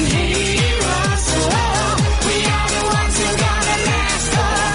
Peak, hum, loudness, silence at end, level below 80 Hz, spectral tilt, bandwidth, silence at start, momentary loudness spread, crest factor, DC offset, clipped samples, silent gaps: -4 dBFS; none; -16 LUFS; 0 s; -24 dBFS; -3.5 dB/octave; 11 kHz; 0 s; 1 LU; 12 dB; under 0.1%; under 0.1%; none